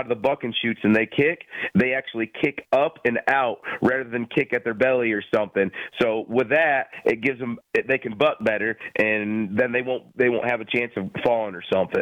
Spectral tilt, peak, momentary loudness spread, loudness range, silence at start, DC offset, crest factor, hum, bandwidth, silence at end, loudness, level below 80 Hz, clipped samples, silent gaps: -7 dB/octave; -8 dBFS; 5 LU; 1 LU; 0 s; under 0.1%; 14 dB; none; 10.5 kHz; 0 s; -23 LUFS; -62 dBFS; under 0.1%; none